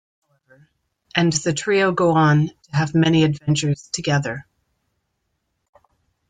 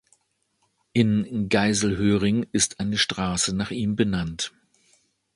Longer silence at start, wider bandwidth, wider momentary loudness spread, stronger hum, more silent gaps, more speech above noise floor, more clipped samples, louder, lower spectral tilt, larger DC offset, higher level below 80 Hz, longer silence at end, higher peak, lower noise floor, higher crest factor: first, 1.15 s vs 0.95 s; second, 9.4 kHz vs 11.5 kHz; about the same, 8 LU vs 6 LU; neither; neither; first, 55 dB vs 48 dB; neither; first, -19 LUFS vs -23 LUFS; first, -5.5 dB/octave vs -4 dB/octave; neither; second, -56 dBFS vs -48 dBFS; first, 1.9 s vs 0.9 s; about the same, -4 dBFS vs -6 dBFS; about the same, -73 dBFS vs -71 dBFS; about the same, 18 dB vs 20 dB